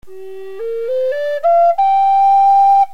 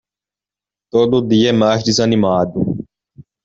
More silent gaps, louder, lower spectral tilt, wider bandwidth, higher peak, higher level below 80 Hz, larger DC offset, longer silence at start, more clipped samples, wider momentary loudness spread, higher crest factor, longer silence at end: neither; first, -12 LUFS vs -15 LUFS; second, -4 dB/octave vs -5.5 dB/octave; second, 6.2 kHz vs 8 kHz; about the same, -4 dBFS vs -2 dBFS; second, -60 dBFS vs -50 dBFS; first, 3% vs under 0.1%; second, 0.1 s vs 0.95 s; neither; first, 19 LU vs 7 LU; second, 8 dB vs 14 dB; second, 0.05 s vs 0.25 s